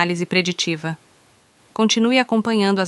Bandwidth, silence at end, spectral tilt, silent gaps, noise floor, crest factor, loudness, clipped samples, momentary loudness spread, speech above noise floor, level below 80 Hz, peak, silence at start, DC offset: 11.5 kHz; 0 s; -4 dB/octave; none; -55 dBFS; 18 dB; -19 LUFS; under 0.1%; 13 LU; 36 dB; -66 dBFS; -2 dBFS; 0 s; under 0.1%